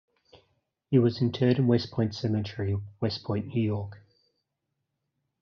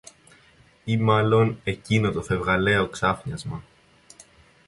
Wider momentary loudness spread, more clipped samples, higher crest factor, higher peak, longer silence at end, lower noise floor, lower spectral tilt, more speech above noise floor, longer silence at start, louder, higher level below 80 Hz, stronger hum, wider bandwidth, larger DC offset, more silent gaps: second, 8 LU vs 14 LU; neither; about the same, 20 dB vs 18 dB; second, -10 dBFS vs -6 dBFS; first, 1.45 s vs 1.05 s; first, -82 dBFS vs -56 dBFS; about the same, -7.5 dB/octave vs -6.5 dB/octave; first, 56 dB vs 34 dB; about the same, 0.9 s vs 0.85 s; second, -28 LUFS vs -23 LUFS; second, -66 dBFS vs -48 dBFS; neither; second, 6.6 kHz vs 11.5 kHz; neither; neither